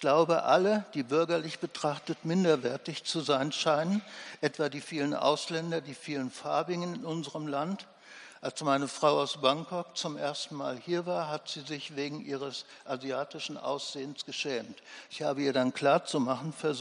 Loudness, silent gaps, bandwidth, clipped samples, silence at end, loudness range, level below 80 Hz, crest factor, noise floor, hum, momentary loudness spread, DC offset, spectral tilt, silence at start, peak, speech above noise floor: -31 LUFS; none; 10.5 kHz; under 0.1%; 0 s; 6 LU; -82 dBFS; 20 dB; -52 dBFS; none; 11 LU; under 0.1%; -4.5 dB/octave; 0 s; -10 dBFS; 21 dB